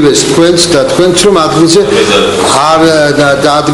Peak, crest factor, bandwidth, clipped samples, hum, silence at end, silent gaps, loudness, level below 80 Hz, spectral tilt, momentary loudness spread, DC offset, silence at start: 0 dBFS; 6 dB; 14 kHz; 2%; none; 0 s; none; -6 LUFS; -34 dBFS; -4 dB/octave; 2 LU; under 0.1%; 0 s